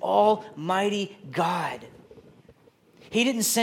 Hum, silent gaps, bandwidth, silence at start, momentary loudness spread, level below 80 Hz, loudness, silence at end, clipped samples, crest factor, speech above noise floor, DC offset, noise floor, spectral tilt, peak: none; none; 17 kHz; 0 s; 10 LU; -70 dBFS; -26 LUFS; 0 s; under 0.1%; 18 dB; 33 dB; under 0.1%; -58 dBFS; -3.5 dB/octave; -8 dBFS